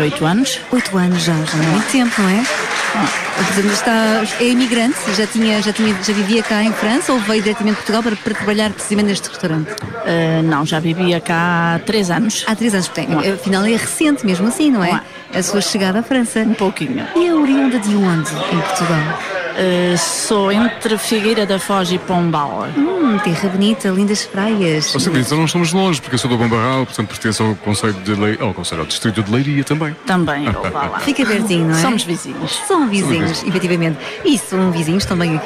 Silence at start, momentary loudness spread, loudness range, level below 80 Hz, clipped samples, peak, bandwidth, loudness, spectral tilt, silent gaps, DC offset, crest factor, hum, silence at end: 0 s; 5 LU; 2 LU; -48 dBFS; under 0.1%; -4 dBFS; 15.5 kHz; -16 LUFS; -4.5 dB/octave; none; under 0.1%; 12 dB; none; 0 s